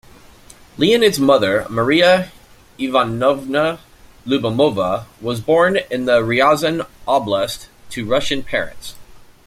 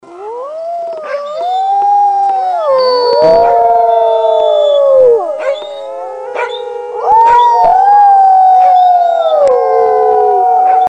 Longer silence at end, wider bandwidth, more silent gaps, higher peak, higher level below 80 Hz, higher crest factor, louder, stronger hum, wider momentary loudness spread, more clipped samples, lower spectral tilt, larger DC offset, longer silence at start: first, 0.3 s vs 0 s; first, 16 kHz vs 9 kHz; neither; about the same, -2 dBFS vs 0 dBFS; about the same, -46 dBFS vs -48 dBFS; first, 16 dB vs 8 dB; second, -17 LUFS vs -9 LUFS; neither; about the same, 15 LU vs 15 LU; neither; about the same, -5 dB/octave vs -4 dB/octave; neither; first, 0.8 s vs 0.05 s